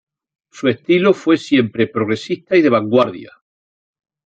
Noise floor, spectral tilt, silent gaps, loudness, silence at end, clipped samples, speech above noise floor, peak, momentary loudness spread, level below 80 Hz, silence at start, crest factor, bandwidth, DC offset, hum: under -90 dBFS; -6.5 dB/octave; none; -16 LUFS; 1 s; under 0.1%; over 75 dB; -2 dBFS; 7 LU; -62 dBFS; 0.55 s; 16 dB; 8.4 kHz; under 0.1%; none